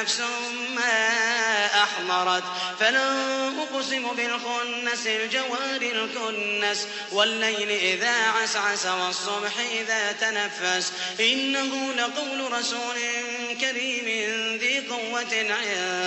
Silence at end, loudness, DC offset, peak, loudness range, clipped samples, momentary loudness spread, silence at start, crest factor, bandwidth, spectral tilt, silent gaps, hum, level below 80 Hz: 0 s; -24 LUFS; under 0.1%; -8 dBFS; 3 LU; under 0.1%; 6 LU; 0 s; 18 dB; 8.4 kHz; -0.5 dB/octave; none; none; -82 dBFS